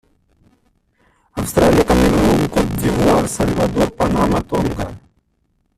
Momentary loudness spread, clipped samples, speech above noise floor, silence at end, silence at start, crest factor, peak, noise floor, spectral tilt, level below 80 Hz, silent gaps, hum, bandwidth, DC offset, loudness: 10 LU; under 0.1%; 49 dB; 0.8 s; 1.35 s; 16 dB; -2 dBFS; -64 dBFS; -6 dB/octave; -30 dBFS; none; none; 15.5 kHz; under 0.1%; -16 LUFS